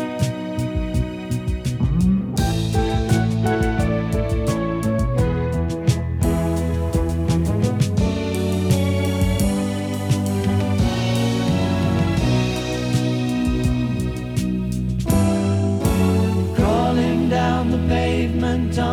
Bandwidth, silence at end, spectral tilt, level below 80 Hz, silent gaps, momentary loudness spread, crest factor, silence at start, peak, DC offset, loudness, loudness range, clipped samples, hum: 17 kHz; 0 s; -6.5 dB/octave; -30 dBFS; none; 5 LU; 16 dB; 0 s; -4 dBFS; under 0.1%; -20 LUFS; 2 LU; under 0.1%; none